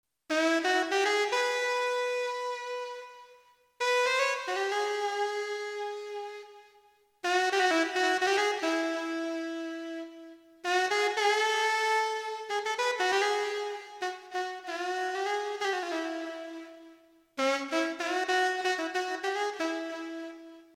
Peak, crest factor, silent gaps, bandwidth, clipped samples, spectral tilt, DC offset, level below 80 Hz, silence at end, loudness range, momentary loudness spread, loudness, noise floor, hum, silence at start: -14 dBFS; 18 dB; none; 16 kHz; under 0.1%; 0 dB/octave; under 0.1%; -86 dBFS; 0.1 s; 4 LU; 13 LU; -30 LUFS; -63 dBFS; none; 0.3 s